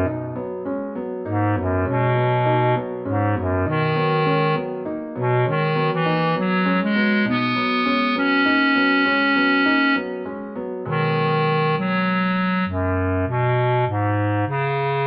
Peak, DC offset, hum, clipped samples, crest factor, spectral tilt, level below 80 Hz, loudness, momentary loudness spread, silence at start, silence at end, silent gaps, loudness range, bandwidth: -8 dBFS; under 0.1%; none; under 0.1%; 12 dB; -9.5 dB/octave; -54 dBFS; -20 LUFS; 10 LU; 0 s; 0 s; none; 3 LU; 5.8 kHz